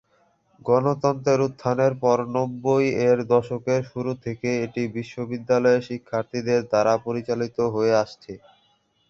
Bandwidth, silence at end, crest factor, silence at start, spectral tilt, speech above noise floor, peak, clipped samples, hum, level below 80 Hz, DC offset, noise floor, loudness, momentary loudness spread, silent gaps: 7.4 kHz; 0.7 s; 18 dB; 0.65 s; -6.5 dB/octave; 43 dB; -4 dBFS; under 0.1%; none; -60 dBFS; under 0.1%; -65 dBFS; -23 LUFS; 9 LU; none